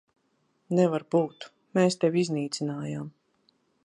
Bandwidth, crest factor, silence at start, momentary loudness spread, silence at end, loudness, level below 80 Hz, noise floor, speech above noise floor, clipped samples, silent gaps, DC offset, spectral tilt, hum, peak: 11 kHz; 18 dB; 0.7 s; 13 LU; 0.75 s; -27 LUFS; -72 dBFS; -72 dBFS; 45 dB; under 0.1%; none; under 0.1%; -6 dB/octave; none; -10 dBFS